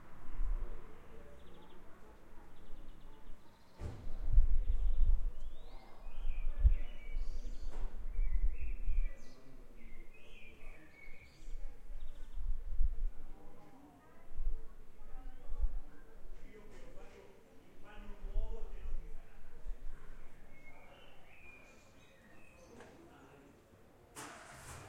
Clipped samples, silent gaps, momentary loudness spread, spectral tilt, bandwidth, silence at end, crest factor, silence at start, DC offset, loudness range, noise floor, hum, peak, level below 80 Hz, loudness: under 0.1%; none; 22 LU; -6 dB/octave; 3.6 kHz; 0 s; 20 dB; 0 s; under 0.1%; 16 LU; -62 dBFS; none; -14 dBFS; -38 dBFS; -44 LUFS